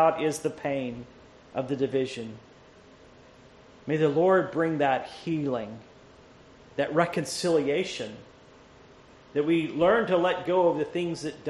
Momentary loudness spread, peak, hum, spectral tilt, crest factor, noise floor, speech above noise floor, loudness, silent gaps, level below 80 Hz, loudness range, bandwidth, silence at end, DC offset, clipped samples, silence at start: 16 LU; -8 dBFS; none; -5.5 dB/octave; 18 dB; -53 dBFS; 27 dB; -27 LUFS; none; -62 dBFS; 5 LU; 11.5 kHz; 0 s; under 0.1%; under 0.1%; 0 s